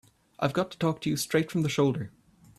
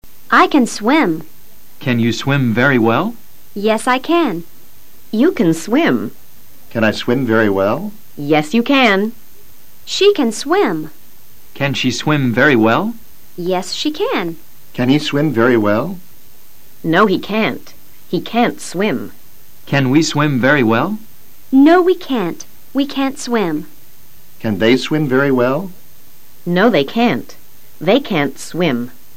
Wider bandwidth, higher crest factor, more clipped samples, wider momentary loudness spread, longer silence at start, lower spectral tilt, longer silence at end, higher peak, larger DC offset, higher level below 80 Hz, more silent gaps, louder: about the same, 15 kHz vs 16.5 kHz; about the same, 18 dB vs 16 dB; neither; second, 6 LU vs 13 LU; first, 0.4 s vs 0 s; about the same, -5.5 dB/octave vs -5.5 dB/octave; first, 0.5 s vs 0.25 s; second, -12 dBFS vs 0 dBFS; second, under 0.1% vs 4%; second, -64 dBFS vs -54 dBFS; neither; second, -28 LUFS vs -15 LUFS